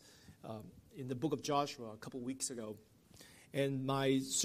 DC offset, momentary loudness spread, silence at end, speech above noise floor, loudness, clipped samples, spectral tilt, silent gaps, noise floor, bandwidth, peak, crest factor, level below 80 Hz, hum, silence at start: under 0.1%; 21 LU; 0 s; 22 dB; -39 LUFS; under 0.1%; -4 dB/octave; none; -61 dBFS; 15.5 kHz; -22 dBFS; 18 dB; -74 dBFS; none; 0.05 s